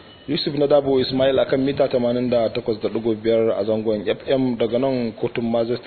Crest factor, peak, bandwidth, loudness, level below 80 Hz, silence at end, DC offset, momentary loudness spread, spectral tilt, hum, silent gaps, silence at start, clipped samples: 16 dB; -4 dBFS; 4.6 kHz; -20 LUFS; -52 dBFS; 0 s; under 0.1%; 6 LU; -10 dB/octave; none; none; 0.05 s; under 0.1%